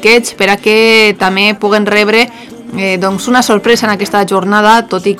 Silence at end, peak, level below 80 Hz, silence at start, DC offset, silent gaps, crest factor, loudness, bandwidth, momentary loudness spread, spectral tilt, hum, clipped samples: 0 s; 0 dBFS; -48 dBFS; 0 s; under 0.1%; none; 10 dB; -9 LUFS; 18 kHz; 7 LU; -3.5 dB/octave; none; 2%